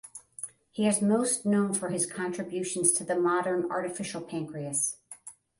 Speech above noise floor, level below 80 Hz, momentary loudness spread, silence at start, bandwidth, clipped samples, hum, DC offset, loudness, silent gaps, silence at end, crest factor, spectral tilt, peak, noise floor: 21 dB; -72 dBFS; 16 LU; 0.05 s; 12 kHz; under 0.1%; none; under 0.1%; -28 LUFS; none; 0.25 s; 22 dB; -4 dB/octave; -8 dBFS; -50 dBFS